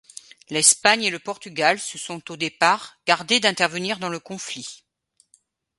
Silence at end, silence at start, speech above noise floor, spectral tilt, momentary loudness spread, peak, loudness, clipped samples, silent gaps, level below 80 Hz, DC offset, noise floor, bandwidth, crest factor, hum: 1.05 s; 0.5 s; 42 dB; -1 dB/octave; 16 LU; 0 dBFS; -21 LUFS; under 0.1%; none; -72 dBFS; under 0.1%; -64 dBFS; 12 kHz; 24 dB; none